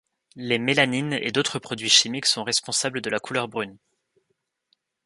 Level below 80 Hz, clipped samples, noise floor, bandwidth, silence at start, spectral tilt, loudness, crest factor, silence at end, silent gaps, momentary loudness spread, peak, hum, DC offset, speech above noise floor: -68 dBFS; under 0.1%; -76 dBFS; 11.5 kHz; 0.35 s; -2 dB/octave; -22 LUFS; 24 dB; 1.3 s; none; 12 LU; -2 dBFS; none; under 0.1%; 51 dB